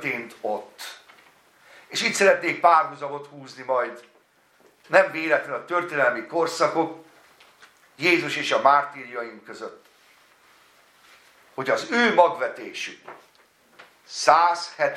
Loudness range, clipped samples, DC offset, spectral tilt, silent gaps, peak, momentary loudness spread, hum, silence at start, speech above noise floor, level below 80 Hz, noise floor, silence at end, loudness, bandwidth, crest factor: 3 LU; under 0.1%; under 0.1%; -3 dB/octave; none; -2 dBFS; 20 LU; none; 0 s; 37 dB; -80 dBFS; -60 dBFS; 0 s; -22 LUFS; 15 kHz; 24 dB